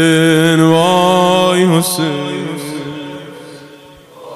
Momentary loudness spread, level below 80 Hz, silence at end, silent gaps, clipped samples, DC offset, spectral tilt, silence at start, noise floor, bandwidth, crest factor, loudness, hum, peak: 18 LU; -56 dBFS; 0 s; none; under 0.1%; under 0.1%; -5 dB/octave; 0 s; -39 dBFS; 16 kHz; 14 dB; -12 LUFS; none; 0 dBFS